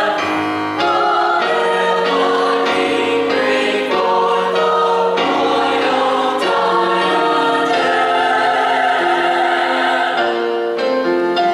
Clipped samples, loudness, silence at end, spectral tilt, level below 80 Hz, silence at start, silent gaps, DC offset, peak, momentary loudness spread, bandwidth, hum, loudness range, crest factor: under 0.1%; -15 LUFS; 0 s; -4 dB/octave; -64 dBFS; 0 s; none; under 0.1%; -4 dBFS; 2 LU; 13 kHz; none; 1 LU; 12 dB